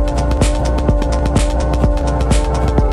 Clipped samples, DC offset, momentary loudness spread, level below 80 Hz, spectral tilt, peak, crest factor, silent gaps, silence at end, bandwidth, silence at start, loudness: under 0.1%; under 0.1%; 1 LU; -16 dBFS; -6.5 dB/octave; -2 dBFS; 10 dB; none; 0 s; 12 kHz; 0 s; -16 LUFS